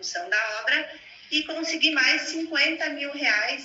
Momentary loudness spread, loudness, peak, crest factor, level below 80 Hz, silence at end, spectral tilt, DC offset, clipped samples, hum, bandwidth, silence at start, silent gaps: 8 LU; -23 LUFS; -6 dBFS; 20 dB; -74 dBFS; 0 s; 0.5 dB/octave; under 0.1%; under 0.1%; none; 8 kHz; 0 s; none